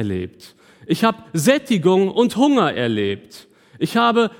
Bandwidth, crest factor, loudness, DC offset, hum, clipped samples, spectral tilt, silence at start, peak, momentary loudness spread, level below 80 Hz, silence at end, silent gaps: 18.5 kHz; 18 dB; -18 LUFS; under 0.1%; none; under 0.1%; -5.5 dB/octave; 0 s; -2 dBFS; 10 LU; -62 dBFS; 0.1 s; none